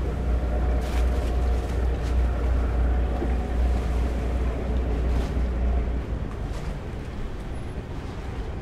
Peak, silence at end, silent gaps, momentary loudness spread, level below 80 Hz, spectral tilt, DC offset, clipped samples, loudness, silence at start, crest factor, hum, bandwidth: -14 dBFS; 0 s; none; 9 LU; -26 dBFS; -7.5 dB/octave; under 0.1%; under 0.1%; -28 LUFS; 0 s; 12 dB; none; 8.4 kHz